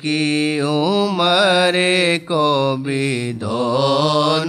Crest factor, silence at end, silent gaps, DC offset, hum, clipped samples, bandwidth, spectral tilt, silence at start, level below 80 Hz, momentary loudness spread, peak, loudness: 14 dB; 0 s; none; under 0.1%; none; under 0.1%; 13.5 kHz; -5 dB/octave; 0 s; -62 dBFS; 6 LU; -4 dBFS; -16 LUFS